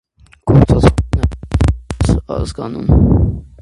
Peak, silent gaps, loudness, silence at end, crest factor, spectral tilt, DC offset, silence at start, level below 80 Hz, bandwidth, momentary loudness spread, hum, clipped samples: 0 dBFS; none; -14 LUFS; 0.15 s; 14 dB; -8 dB/octave; under 0.1%; 0.45 s; -20 dBFS; 11.5 kHz; 10 LU; none; under 0.1%